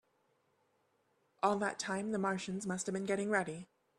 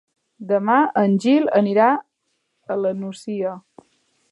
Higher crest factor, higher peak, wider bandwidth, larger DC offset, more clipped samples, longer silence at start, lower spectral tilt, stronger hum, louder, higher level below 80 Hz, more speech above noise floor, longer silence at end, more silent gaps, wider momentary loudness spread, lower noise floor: about the same, 22 dB vs 18 dB; second, -16 dBFS vs -2 dBFS; about the same, 12 kHz vs 11 kHz; neither; neither; first, 1.4 s vs 0.4 s; second, -4.5 dB/octave vs -7 dB/octave; neither; second, -36 LUFS vs -19 LUFS; about the same, -78 dBFS vs -76 dBFS; second, 41 dB vs 54 dB; second, 0.35 s vs 0.7 s; neither; second, 5 LU vs 12 LU; first, -77 dBFS vs -72 dBFS